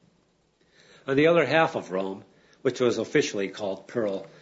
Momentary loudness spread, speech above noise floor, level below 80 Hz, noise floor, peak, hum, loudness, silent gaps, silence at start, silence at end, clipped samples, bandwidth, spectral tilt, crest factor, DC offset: 13 LU; 42 dB; -70 dBFS; -67 dBFS; -6 dBFS; none; -25 LUFS; none; 1.05 s; 0.15 s; under 0.1%; 8 kHz; -5 dB/octave; 20 dB; under 0.1%